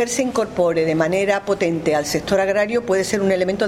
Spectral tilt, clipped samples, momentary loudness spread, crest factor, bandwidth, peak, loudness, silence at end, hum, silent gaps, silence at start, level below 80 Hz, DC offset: -4.5 dB/octave; under 0.1%; 2 LU; 16 dB; 16 kHz; -4 dBFS; -19 LUFS; 0 s; none; none; 0 s; -48 dBFS; under 0.1%